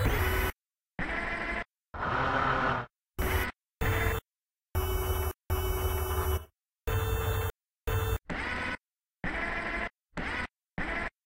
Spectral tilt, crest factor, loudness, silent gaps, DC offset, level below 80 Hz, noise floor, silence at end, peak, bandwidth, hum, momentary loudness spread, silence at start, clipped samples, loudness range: -5 dB/octave; 18 dB; -33 LUFS; none; under 0.1%; -38 dBFS; under -90 dBFS; 0.15 s; -14 dBFS; 16 kHz; none; 9 LU; 0 s; under 0.1%; 3 LU